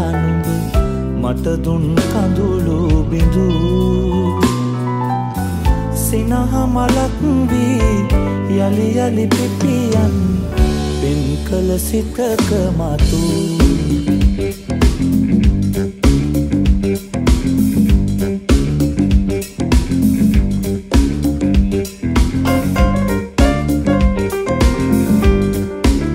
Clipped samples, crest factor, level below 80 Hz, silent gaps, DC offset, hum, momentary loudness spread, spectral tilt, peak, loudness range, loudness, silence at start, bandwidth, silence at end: under 0.1%; 14 dB; -20 dBFS; none; under 0.1%; none; 4 LU; -6.5 dB/octave; 0 dBFS; 1 LU; -16 LUFS; 0 s; 16.5 kHz; 0 s